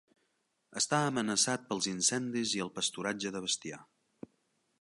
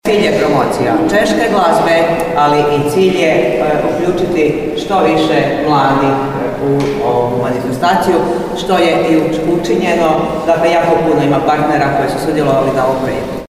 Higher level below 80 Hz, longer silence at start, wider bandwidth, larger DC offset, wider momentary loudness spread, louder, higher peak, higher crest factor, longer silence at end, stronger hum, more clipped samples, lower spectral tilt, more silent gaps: second, -76 dBFS vs -38 dBFS; first, 0.7 s vs 0.05 s; second, 11.5 kHz vs 16 kHz; neither; first, 7 LU vs 4 LU; second, -32 LUFS vs -12 LUFS; second, -14 dBFS vs 0 dBFS; first, 22 dB vs 12 dB; first, 0.95 s vs 0 s; neither; neither; second, -2.5 dB/octave vs -6 dB/octave; neither